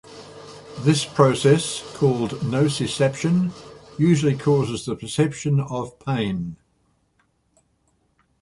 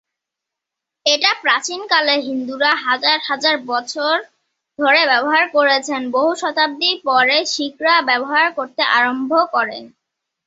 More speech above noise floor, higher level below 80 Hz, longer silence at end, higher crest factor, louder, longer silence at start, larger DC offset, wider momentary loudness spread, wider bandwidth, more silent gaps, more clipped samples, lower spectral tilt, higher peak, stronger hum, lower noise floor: second, 45 dB vs 66 dB; first, -54 dBFS vs -70 dBFS; first, 1.85 s vs 0.6 s; about the same, 20 dB vs 16 dB; second, -21 LUFS vs -16 LUFS; second, 0.1 s vs 1.05 s; neither; first, 19 LU vs 7 LU; first, 11.5 kHz vs 8 kHz; neither; neither; first, -6 dB/octave vs -1 dB/octave; about the same, -2 dBFS vs 0 dBFS; neither; second, -66 dBFS vs -83 dBFS